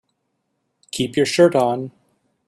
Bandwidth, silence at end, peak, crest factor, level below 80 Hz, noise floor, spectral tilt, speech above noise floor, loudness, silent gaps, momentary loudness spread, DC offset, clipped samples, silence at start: 14 kHz; 0.6 s; -2 dBFS; 20 dB; -62 dBFS; -73 dBFS; -5 dB/octave; 55 dB; -18 LUFS; none; 16 LU; under 0.1%; under 0.1%; 0.95 s